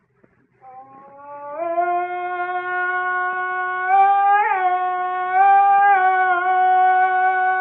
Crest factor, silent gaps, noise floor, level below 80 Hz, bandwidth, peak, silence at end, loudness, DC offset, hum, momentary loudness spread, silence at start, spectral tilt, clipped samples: 12 dB; none; -59 dBFS; -76 dBFS; 3.9 kHz; -6 dBFS; 0 s; -18 LUFS; under 0.1%; none; 11 LU; 0.65 s; -7 dB/octave; under 0.1%